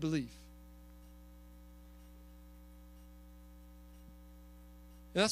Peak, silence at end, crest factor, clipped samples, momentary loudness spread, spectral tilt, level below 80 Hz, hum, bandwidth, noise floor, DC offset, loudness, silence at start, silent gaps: -16 dBFS; 0 s; 26 dB; under 0.1%; 19 LU; -4.5 dB/octave; -56 dBFS; 60 Hz at -55 dBFS; 15.5 kHz; -56 dBFS; under 0.1%; -38 LUFS; 0 s; none